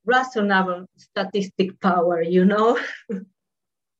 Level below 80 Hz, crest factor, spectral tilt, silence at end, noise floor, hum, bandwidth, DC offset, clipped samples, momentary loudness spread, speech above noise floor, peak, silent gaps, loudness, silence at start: -72 dBFS; 16 dB; -6.5 dB/octave; 0.75 s; -88 dBFS; none; 7.8 kHz; under 0.1%; under 0.1%; 14 LU; 67 dB; -6 dBFS; none; -21 LUFS; 0.05 s